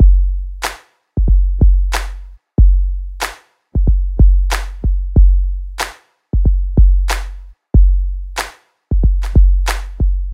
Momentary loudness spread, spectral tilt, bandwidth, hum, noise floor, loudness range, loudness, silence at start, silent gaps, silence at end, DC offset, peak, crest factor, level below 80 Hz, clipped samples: 11 LU; -5.5 dB/octave; 13 kHz; none; -34 dBFS; 2 LU; -17 LUFS; 0 s; none; 0 s; under 0.1%; 0 dBFS; 12 dB; -12 dBFS; under 0.1%